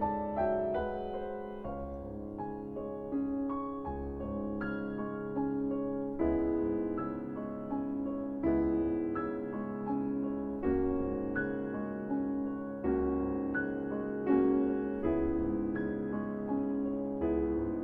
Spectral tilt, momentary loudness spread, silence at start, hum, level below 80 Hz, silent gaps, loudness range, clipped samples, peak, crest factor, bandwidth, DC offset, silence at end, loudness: -10.5 dB/octave; 8 LU; 0 s; none; -50 dBFS; none; 5 LU; under 0.1%; -18 dBFS; 16 dB; 3.6 kHz; under 0.1%; 0 s; -34 LUFS